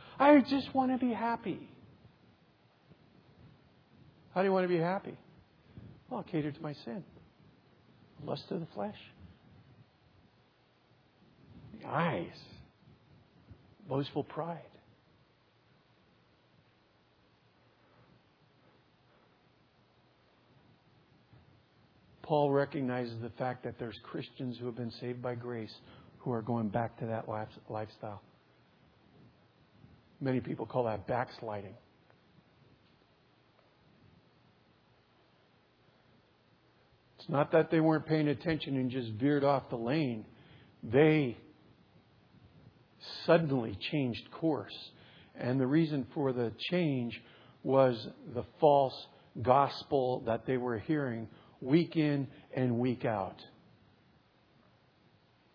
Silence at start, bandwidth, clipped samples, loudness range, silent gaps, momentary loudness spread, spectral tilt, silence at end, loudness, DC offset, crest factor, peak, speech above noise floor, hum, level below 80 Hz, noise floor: 0 s; 5.4 kHz; under 0.1%; 13 LU; none; 19 LU; -6 dB/octave; 2.1 s; -33 LUFS; under 0.1%; 24 dB; -10 dBFS; 36 dB; none; -72 dBFS; -68 dBFS